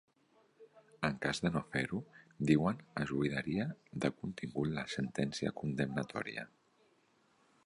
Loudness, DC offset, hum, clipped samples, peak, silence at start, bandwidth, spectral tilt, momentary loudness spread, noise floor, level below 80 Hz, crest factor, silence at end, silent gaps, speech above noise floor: -37 LUFS; under 0.1%; none; under 0.1%; -16 dBFS; 0.6 s; 11 kHz; -6 dB/octave; 10 LU; -72 dBFS; -64 dBFS; 22 dB; 1.2 s; none; 36 dB